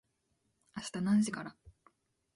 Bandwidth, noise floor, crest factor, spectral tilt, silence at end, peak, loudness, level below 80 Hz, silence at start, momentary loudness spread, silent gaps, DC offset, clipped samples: 11.5 kHz; -79 dBFS; 16 dB; -5.5 dB/octave; 0.65 s; -22 dBFS; -34 LUFS; -70 dBFS; 0.75 s; 19 LU; none; under 0.1%; under 0.1%